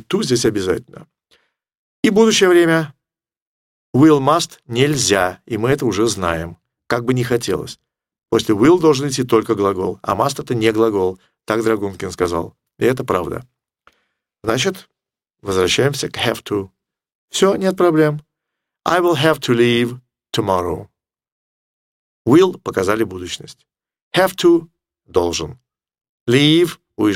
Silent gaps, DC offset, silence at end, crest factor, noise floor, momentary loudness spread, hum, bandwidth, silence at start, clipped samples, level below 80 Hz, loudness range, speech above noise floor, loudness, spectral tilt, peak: 1.77-2.03 s, 3.42-3.93 s, 17.15-17.28 s, 21.32-22.25 s, 24.02-24.11 s, 26.09-26.26 s; under 0.1%; 0 s; 18 dB; -86 dBFS; 13 LU; none; 16.5 kHz; 0.1 s; under 0.1%; -50 dBFS; 5 LU; 70 dB; -17 LUFS; -5 dB/octave; 0 dBFS